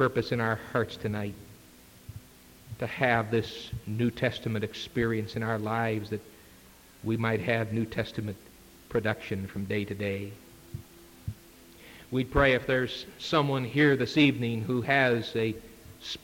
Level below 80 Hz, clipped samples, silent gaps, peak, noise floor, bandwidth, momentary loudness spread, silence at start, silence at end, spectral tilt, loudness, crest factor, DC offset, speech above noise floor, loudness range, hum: -52 dBFS; under 0.1%; none; -8 dBFS; -54 dBFS; 17 kHz; 21 LU; 0 s; 0.05 s; -6.5 dB/octave; -29 LUFS; 22 dB; under 0.1%; 26 dB; 8 LU; none